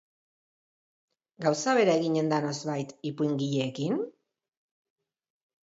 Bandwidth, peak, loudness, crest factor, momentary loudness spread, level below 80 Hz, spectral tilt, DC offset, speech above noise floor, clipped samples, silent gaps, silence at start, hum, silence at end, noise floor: 8 kHz; -12 dBFS; -28 LUFS; 20 dB; 10 LU; -78 dBFS; -5.5 dB/octave; under 0.1%; over 63 dB; under 0.1%; none; 1.4 s; none; 1.6 s; under -90 dBFS